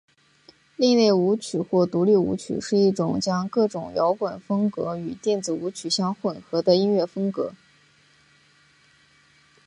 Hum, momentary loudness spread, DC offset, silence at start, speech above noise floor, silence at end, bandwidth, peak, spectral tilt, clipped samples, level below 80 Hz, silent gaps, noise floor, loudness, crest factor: none; 9 LU; under 0.1%; 0.8 s; 36 dB; 2.1 s; 11 kHz; -6 dBFS; -6 dB/octave; under 0.1%; -62 dBFS; none; -58 dBFS; -23 LUFS; 18 dB